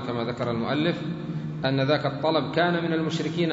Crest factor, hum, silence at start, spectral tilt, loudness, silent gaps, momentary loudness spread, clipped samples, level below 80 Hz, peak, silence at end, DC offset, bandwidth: 18 dB; none; 0 s; -6.5 dB/octave; -26 LUFS; none; 8 LU; under 0.1%; -58 dBFS; -8 dBFS; 0 s; under 0.1%; 7.8 kHz